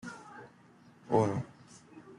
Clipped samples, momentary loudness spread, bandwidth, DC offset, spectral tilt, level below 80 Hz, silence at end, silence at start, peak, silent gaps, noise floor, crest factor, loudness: under 0.1%; 25 LU; 11 kHz; under 0.1%; -7.5 dB/octave; -72 dBFS; 0.05 s; 0.05 s; -14 dBFS; none; -59 dBFS; 22 dB; -31 LUFS